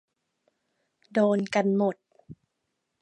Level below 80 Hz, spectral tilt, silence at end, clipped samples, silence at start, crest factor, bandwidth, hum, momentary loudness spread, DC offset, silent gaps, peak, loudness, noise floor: -74 dBFS; -7 dB/octave; 0.65 s; under 0.1%; 1.15 s; 18 dB; 9 kHz; none; 7 LU; under 0.1%; none; -12 dBFS; -26 LUFS; -80 dBFS